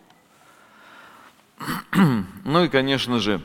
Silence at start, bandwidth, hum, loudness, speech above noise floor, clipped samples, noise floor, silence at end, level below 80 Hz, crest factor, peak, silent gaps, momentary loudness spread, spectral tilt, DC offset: 1.6 s; 17 kHz; none; -21 LUFS; 34 dB; under 0.1%; -54 dBFS; 0 s; -52 dBFS; 20 dB; -4 dBFS; none; 11 LU; -6 dB/octave; under 0.1%